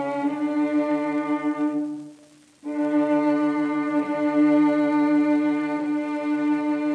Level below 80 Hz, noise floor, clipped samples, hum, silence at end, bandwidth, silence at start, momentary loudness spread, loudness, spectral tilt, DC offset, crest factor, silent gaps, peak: -82 dBFS; -52 dBFS; under 0.1%; none; 0 s; 6 kHz; 0 s; 6 LU; -23 LUFS; -7 dB/octave; under 0.1%; 12 dB; none; -10 dBFS